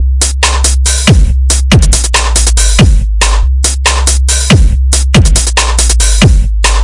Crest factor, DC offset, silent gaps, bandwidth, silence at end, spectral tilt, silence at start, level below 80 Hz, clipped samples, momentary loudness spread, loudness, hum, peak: 6 dB; under 0.1%; none; 12 kHz; 0 s; -3.5 dB/octave; 0 s; -8 dBFS; 1%; 3 LU; -8 LUFS; none; 0 dBFS